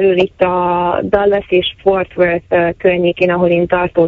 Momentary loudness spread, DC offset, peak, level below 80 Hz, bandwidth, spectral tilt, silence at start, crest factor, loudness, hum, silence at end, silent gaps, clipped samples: 2 LU; under 0.1%; 0 dBFS; -40 dBFS; 4.9 kHz; -8 dB/octave; 0 s; 14 dB; -14 LUFS; none; 0 s; none; under 0.1%